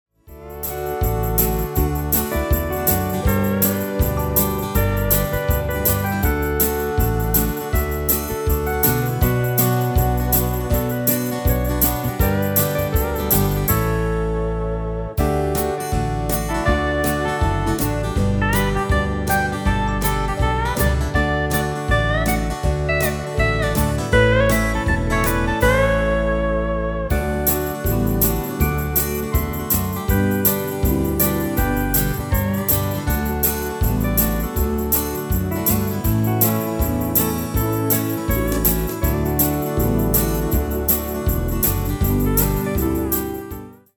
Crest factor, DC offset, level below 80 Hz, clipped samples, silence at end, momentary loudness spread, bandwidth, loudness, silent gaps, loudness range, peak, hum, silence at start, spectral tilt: 18 dB; under 0.1%; -26 dBFS; under 0.1%; 0.2 s; 4 LU; over 20 kHz; -19 LUFS; none; 2 LU; -2 dBFS; none; 0.3 s; -5.5 dB/octave